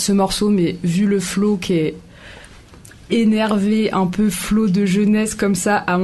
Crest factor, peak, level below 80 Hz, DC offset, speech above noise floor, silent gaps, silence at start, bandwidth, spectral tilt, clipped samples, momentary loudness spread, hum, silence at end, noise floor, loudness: 14 dB; -4 dBFS; -44 dBFS; 0.2%; 25 dB; none; 0 s; 12.5 kHz; -5.5 dB/octave; under 0.1%; 3 LU; none; 0 s; -42 dBFS; -17 LUFS